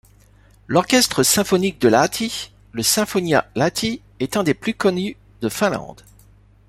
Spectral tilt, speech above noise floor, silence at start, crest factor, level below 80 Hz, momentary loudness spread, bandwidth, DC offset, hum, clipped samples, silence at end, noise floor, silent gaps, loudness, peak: -3.5 dB/octave; 32 dB; 0.7 s; 18 dB; -50 dBFS; 12 LU; 16 kHz; under 0.1%; 50 Hz at -45 dBFS; under 0.1%; 0.75 s; -51 dBFS; none; -19 LUFS; -2 dBFS